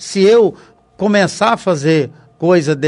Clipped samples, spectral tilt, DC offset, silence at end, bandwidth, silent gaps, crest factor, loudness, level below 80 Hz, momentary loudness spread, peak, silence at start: under 0.1%; -5.5 dB/octave; under 0.1%; 0 s; 11 kHz; none; 14 dB; -13 LUFS; -58 dBFS; 9 LU; 0 dBFS; 0 s